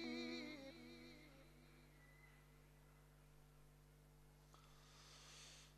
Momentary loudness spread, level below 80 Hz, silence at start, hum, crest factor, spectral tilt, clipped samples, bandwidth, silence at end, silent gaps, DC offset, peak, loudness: 18 LU; -72 dBFS; 0 s; 50 Hz at -70 dBFS; 20 dB; -4 dB/octave; under 0.1%; 13 kHz; 0 s; none; under 0.1%; -38 dBFS; -59 LUFS